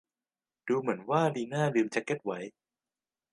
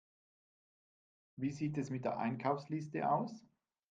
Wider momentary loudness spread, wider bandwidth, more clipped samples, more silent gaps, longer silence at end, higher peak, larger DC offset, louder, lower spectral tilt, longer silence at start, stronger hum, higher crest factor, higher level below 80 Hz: first, 12 LU vs 7 LU; first, 11.5 kHz vs 9 kHz; neither; neither; first, 0.85 s vs 0.5 s; first, -12 dBFS vs -20 dBFS; neither; first, -31 LUFS vs -39 LUFS; about the same, -6.5 dB/octave vs -7.5 dB/octave; second, 0.65 s vs 1.35 s; neither; about the same, 20 dB vs 20 dB; about the same, -80 dBFS vs -78 dBFS